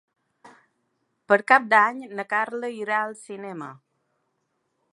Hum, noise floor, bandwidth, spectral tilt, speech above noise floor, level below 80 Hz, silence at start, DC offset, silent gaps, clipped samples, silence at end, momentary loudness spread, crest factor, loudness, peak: none; -75 dBFS; 11.5 kHz; -4.5 dB/octave; 52 dB; -84 dBFS; 0.45 s; under 0.1%; none; under 0.1%; 1.2 s; 19 LU; 24 dB; -22 LUFS; -2 dBFS